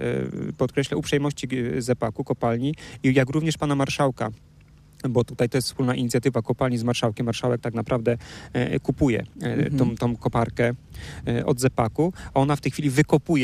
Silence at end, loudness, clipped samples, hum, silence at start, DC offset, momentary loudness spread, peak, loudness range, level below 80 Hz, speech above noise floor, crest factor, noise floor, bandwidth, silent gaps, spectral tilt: 0 s; -24 LUFS; under 0.1%; none; 0 s; under 0.1%; 6 LU; -6 dBFS; 1 LU; -48 dBFS; 28 dB; 18 dB; -51 dBFS; 15 kHz; none; -6 dB/octave